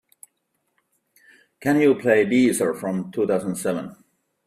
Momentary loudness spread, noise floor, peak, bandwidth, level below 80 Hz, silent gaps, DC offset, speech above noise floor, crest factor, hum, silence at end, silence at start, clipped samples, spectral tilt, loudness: 10 LU; -74 dBFS; -4 dBFS; 15 kHz; -64 dBFS; none; under 0.1%; 53 dB; 20 dB; none; 0.55 s; 1.6 s; under 0.1%; -5.5 dB/octave; -21 LUFS